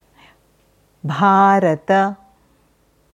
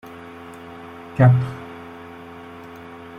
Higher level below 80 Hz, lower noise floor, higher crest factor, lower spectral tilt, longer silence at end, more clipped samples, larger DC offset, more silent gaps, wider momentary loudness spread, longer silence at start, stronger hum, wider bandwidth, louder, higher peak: second, -62 dBFS vs -54 dBFS; first, -58 dBFS vs -39 dBFS; about the same, 18 dB vs 20 dB; second, -7 dB/octave vs -9 dB/octave; first, 1 s vs 0 s; neither; neither; neither; second, 17 LU vs 23 LU; first, 1.05 s vs 0.05 s; neither; first, 10 kHz vs 4.6 kHz; first, -15 LUFS vs -18 LUFS; about the same, -2 dBFS vs -2 dBFS